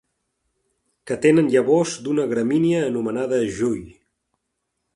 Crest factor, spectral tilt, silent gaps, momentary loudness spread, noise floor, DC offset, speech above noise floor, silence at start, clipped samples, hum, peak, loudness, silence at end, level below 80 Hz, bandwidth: 18 dB; -6 dB/octave; none; 8 LU; -77 dBFS; under 0.1%; 57 dB; 1.05 s; under 0.1%; none; -4 dBFS; -20 LUFS; 1.05 s; -58 dBFS; 11.5 kHz